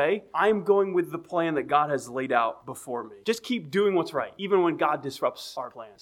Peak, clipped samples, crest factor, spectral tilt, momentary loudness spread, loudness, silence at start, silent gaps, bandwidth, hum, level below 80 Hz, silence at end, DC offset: -8 dBFS; under 0.1%; 20 dB; -5.5 dB/octave; 12 LU; -26 LUFS; 0 s; none; 15.5 kHz; none; -70 dBFS; 0.1 s; under 0.1%